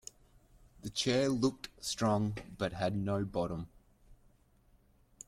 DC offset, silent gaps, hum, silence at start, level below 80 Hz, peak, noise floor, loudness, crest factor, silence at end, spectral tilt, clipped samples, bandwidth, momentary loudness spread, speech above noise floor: under 0.1%; none; none; 0.85 s; -60 dBFS; -16 dBFS; -67 dBFS; -34 LUFS; 20 dB; 1.15 s; -5 dB/octave; under 0.1%; 15.5 kHz; 13 LU; 33 dB